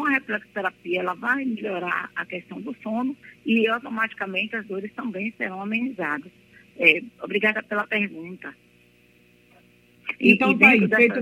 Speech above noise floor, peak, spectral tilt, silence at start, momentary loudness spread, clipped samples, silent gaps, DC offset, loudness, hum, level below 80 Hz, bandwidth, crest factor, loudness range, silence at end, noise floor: 34 dB; 0 dBFS; -6.5 dB/octave; 0 s; 17 LU; under 0.1%; none; under 0.1%; -22 LUFS; 60 Hz at -55 dBFS; -70 dBFS; 16 kHz; 24 dB; 6 LU; 0 s; -57 dBFS